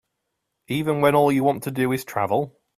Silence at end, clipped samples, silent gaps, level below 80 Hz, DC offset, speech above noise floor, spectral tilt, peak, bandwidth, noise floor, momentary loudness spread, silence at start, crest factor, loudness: 0.3 s; under 0.1%; none; -60 dBFS; under 0.1%; 57 dB; -6.5 dB/octave; -4 dBFS; 16 kHz; -78 dBFS; 8 LU; 0.7 s; 18 dB; -22 LUFS